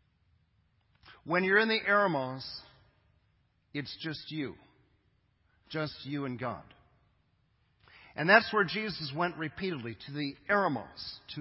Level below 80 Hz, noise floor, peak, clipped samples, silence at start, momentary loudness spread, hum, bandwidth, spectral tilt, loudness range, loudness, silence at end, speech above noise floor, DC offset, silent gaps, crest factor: -68 dBFS; -72 dBFS; -8 dBFS; under 0.1%; 1.05 s; 17 LU; none; 5.8 kHz; -8.5 dB/octave; 12 LU; -31 LUFS; 0 s; 40 dB; under 0.1%; none; 26 dB